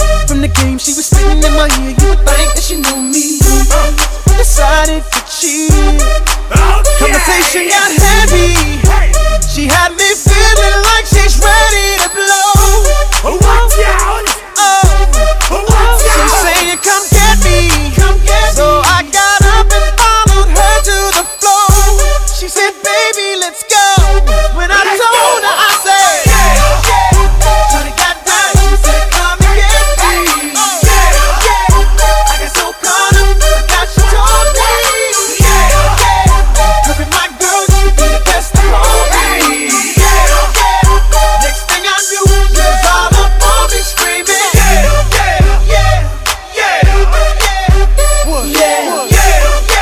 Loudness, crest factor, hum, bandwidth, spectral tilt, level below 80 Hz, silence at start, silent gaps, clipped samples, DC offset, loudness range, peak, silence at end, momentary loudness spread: -9 LUFS; 8 dB; none; 16 kHz; -3 dB/octave; -10 dBFS; 0 s; none; 3%; under 0.1%; 2 LU; 0 dBFS; 0 s; 4 LU